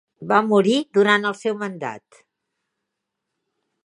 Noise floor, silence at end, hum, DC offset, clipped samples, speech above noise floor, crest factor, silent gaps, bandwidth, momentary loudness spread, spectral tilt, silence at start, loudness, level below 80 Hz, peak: -81 dBFS; 1.85 s; none; under 0.1%; under 0.1%; 61 dB; 20 dB; none; 11 kHz; 15 LU; -5 dB/octave; 0.2 s; -19 LUFS; -74 dBFS; -2 dBFS